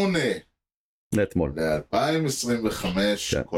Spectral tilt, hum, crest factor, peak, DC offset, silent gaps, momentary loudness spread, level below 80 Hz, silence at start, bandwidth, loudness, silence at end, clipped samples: -4.5 dB/octave; none; 14 dB; -12 dBFS; under 0.1%; 0.77-1.10 s; 4 LU; -46 dBFS; 0 s; 16.5 kHz; -25 LUFS; 0 s; under 0.1%